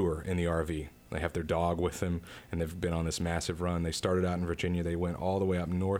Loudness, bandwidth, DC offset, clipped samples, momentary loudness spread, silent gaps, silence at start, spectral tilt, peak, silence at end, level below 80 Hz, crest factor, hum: -33 LUFS; 16 kHz; under 0.1%; under 0.1%; 6 LU; none; 0 s; -6 dB/octave; -16 dBFS; 0 s; -46 dBFS; 16 dB; none